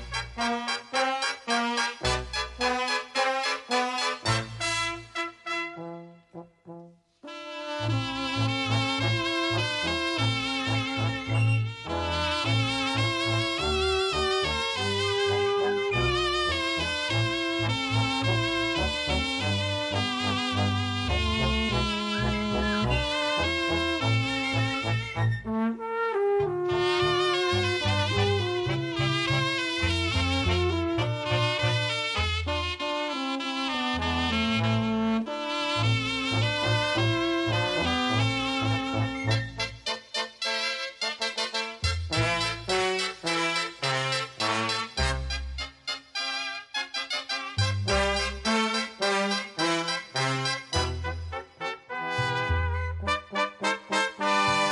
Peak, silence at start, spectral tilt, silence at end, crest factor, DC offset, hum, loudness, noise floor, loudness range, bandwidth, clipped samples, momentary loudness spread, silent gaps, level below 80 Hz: -12 dBFS; 0 s; -4.5 dB/octave; 0 s; 16 dB; under 0.1%; none; -27 LUFS; -49 dBFS; 4 LU; 11.5 kHz; under 0.1%; 6 LU; none; -40 dBFS